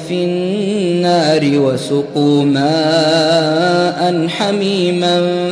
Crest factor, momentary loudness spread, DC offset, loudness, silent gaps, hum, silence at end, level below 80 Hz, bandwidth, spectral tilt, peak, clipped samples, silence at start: 12 dB; 5 LU; under 0.1%; -14 LUFS; none; none; 0 s; -58 dBFS; 11 kHz; -5.5 dB/octave; -2 dBFS; under 0.1%; 0 s